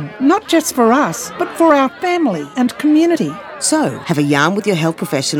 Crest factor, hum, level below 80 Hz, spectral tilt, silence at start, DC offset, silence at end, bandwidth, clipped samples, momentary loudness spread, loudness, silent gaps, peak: 14 dB; none; -58 dBFS; -4.5 dB/octave; 0 s; under 0.1%; 0 s; 17.5 kHz; under 0.1%; 6 LU; -15 LUFS; none; 0 dBFS